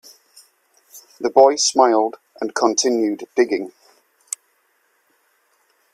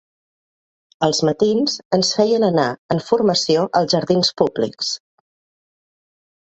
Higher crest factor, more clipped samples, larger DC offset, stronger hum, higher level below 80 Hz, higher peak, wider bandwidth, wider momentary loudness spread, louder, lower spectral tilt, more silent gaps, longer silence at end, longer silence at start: about the same, 20 dB vs 18 dB; neither; neither; neither; second, -70 dBFS vs -58 dBFS; about the same, 0 dBFS vs 0 dBFS; first, 15 kHz vs 8.2 kHz; first, 17 LU vs 6 LU; about the same, -18 LUFS vs -18 LUFS; second, -1.5 dB/octave vs -4.5 dB/octave; second, none vs 1.85-1.91 s, 2.78-2.89 s; first, 2.25 s vs 1.5 s; about the same, 0.95 s vs 1 s